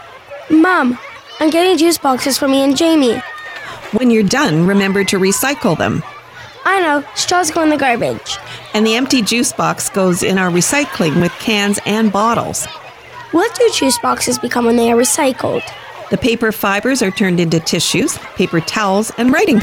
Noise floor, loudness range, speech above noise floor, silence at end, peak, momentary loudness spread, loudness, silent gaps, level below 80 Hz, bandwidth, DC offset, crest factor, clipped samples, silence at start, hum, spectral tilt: -34 dBFS; 2 LU; 21 dB; 0 s; -2 dBFS; 11 LU; -14 LUFS; none; -48 dBFS; over 20 kHz; under 0.1%; 12 dB; under 0.1%; 0 s; none; -4 dB/octave